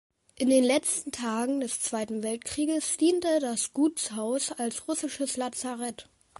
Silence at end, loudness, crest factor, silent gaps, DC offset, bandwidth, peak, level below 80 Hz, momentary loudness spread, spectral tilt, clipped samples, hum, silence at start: 0.35 s; -28 LUFS; 18 dB; none; under 0.1%; 12 kHz; -10 dBFS; -66 dBFS; 9 LU; -2.5 dB/octave; under 0.1%; none; 0.4 s